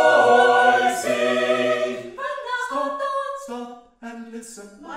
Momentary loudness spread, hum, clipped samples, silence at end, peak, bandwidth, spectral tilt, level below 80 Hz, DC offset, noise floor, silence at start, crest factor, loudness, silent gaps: 24 LU; none; under 0.1%; 0 s; -4 dBFS; 15.5 kHz; -2.5 dB/octave; -66 dBFS; under 0.1%; -40 dBFS; 0 s; 18 dB; -20 LUFS; none